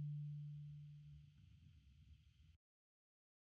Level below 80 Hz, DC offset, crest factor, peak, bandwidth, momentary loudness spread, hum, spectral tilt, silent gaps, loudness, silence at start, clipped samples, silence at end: -74 dBFS; under 0.1%; 14 dB; -42 dBFS; 4.9 kHz; 19 LU; none; -10 dB/octave; none; -54 LUFS; 0 s; under 0.1%; 0.85 s